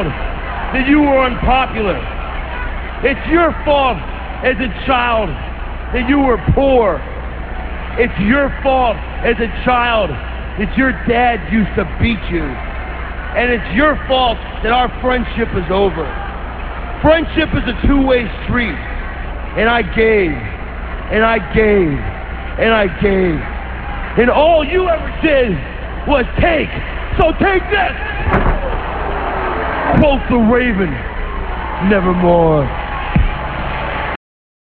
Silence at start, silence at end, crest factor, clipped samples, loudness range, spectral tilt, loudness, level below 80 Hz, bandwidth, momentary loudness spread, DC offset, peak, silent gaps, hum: 0 s; 0.5 s; 14 dB; under 0.1%; 2 LU; -9.5 dB/octave; -15 LUFS; -24 dBFS; 4.7 kHz; 12 LU; 0.7%; 0 dBFS; none; none